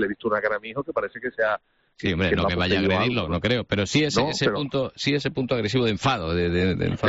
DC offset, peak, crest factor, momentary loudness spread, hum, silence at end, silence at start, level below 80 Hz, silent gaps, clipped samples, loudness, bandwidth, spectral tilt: under 0.1%; -8 dBFS; 16 dB; 7 LU; none; 0 s; 0 s; -48 dBFS; none; under 0.1%; -24 LUFS; 8 kHz; -4 dB/octave